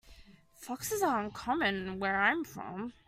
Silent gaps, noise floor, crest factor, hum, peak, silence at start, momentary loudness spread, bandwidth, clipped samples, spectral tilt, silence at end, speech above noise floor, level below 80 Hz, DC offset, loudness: none; -57 dBFS; 20 dB; none; -14 dBFS; 0.05 s; 12 LU; 16 kHz; under 0.1%; -3.5 dB/octave; 0.15 s; 24 dB; -60 dBFS; under 0.1%; -32 LUFS